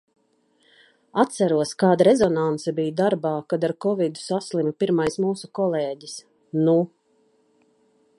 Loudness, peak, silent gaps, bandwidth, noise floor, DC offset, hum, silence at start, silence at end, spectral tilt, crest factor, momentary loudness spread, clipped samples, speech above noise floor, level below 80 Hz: -22 LUFS; -2 dBFS; none; 11.5 kHz; -65 dBFS; under 0.1%; none; 1.15 s; 1.3 s; -6 dB/octave; 20 dB; 12 LU; under 0.1%; 43 dB; -64 dBFS